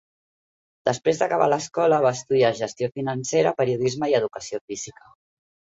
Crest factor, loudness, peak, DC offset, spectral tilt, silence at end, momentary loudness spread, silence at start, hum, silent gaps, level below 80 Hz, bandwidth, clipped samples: 18 dB; -23 LUFS; -6 dBFS; under 0.1%; -5 dB/octave; 0.7 s; 11 LU; 0.85 s; none; 4.61-4.68 s; -64 dBFS; 8 kHz; under 0.1%